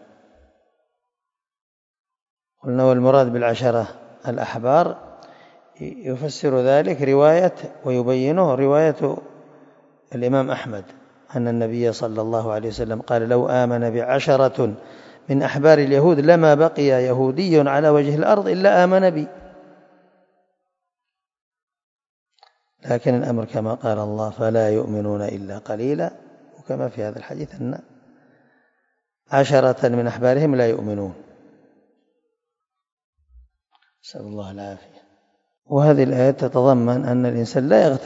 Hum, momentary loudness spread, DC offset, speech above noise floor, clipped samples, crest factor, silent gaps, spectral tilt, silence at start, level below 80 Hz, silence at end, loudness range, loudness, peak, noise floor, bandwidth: none; 17 LU; under 0.1%; 68 dB; under 0.1%; 20 dB; 21.42-21.51 s, 21.63-21.67 s, 21.83-21.99 s, 22.09-22.26 s, 32.92-32.97 s, 33.04-33.13 s, 35.58-35.62 s; -7.5 dB/octave; 2.65 s; -60 dBFS; 0 s; 12 LU; -19 LUFS; 0 dBFS; -86 dBFS; 7.8 kHz